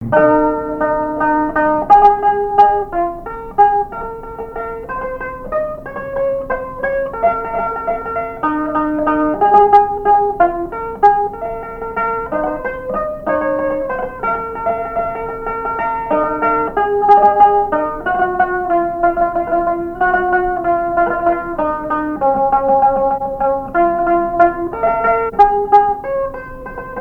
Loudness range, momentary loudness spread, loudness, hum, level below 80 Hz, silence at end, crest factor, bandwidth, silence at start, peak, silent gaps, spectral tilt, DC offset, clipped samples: 6 LU; 12 LU; -15 LUFS; none; -38 dBFS; 0 s; 16 dB; 5.6 kHz; 0 s; 0 dBFS; none; -8 dB/octave; under 0.1%; under 0.1%